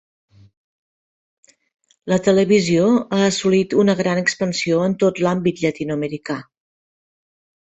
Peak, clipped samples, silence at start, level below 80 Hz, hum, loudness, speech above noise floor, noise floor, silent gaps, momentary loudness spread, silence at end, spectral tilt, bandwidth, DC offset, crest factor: -4 dBFS; under 0.1%; 2.05 s; -58 dBFS; none; -18 LUFS; over 73 dB; under -90 dBFS; none; 10 LU; 1.3 s; -5.5 dB/octave; 8.2 kHz; under 0.1%; 16 dB